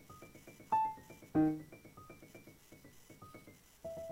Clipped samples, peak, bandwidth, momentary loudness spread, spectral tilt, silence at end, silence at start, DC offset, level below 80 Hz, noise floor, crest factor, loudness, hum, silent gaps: under 0.1%; -22 dBFS; 16 kHz; 25 LU; -7 dB/octave; 0 s; 0.1 s; under 0.1%; -68 dBFS; -60 dBFS; 20 dB; -37 LUFS; none; none